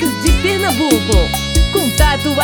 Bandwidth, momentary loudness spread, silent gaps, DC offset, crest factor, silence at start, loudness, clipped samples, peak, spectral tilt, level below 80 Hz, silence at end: over 20 kHz; 2 LU; none; under 0.1%; 14 dB; 0 s; -14 LUFS; under 0.1%; 0 dBFS; -4 dB/octave; -18 dBFS; 0 s